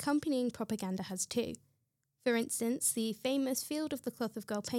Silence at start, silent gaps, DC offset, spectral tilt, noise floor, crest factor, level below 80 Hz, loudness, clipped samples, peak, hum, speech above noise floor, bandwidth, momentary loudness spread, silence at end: 0 s; none; under 0.1%; -3.5 dB/octave; -80 dBFS; 18 dB; -74 dBFS; -35 LUFS; under 0.1%; -18 dBFS; none; 45 dB; 17 kHz; 7 LU; 0 s